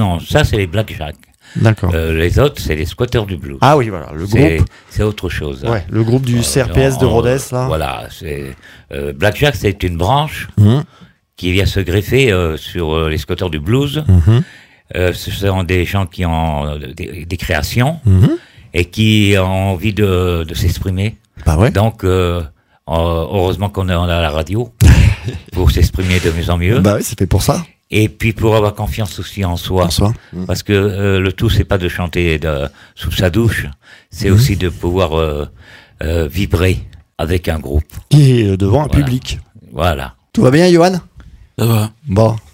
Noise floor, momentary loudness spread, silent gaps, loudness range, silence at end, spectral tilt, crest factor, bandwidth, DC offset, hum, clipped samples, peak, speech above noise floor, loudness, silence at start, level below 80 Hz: -36 dBFS; 12 LU; none; 3 LU; 0.15 s; -6 dB/octave; 14 dB; 16.5 kHz; under 0.1%; none; under 0.1%; 0 dBFS; 22 dB; -14 LUFS; 0 s; -24 dBFS